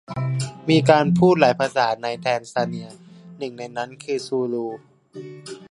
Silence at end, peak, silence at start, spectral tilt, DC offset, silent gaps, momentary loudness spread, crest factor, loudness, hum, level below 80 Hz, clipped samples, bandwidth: 0.1 s; 0 dBFS; 0.1 s; -6 dB/octave; under 0.1%; none; 22 LU; 22 dB; -21 LUFS; none; -60 dBFS; under 0.1%; 11.5 kHz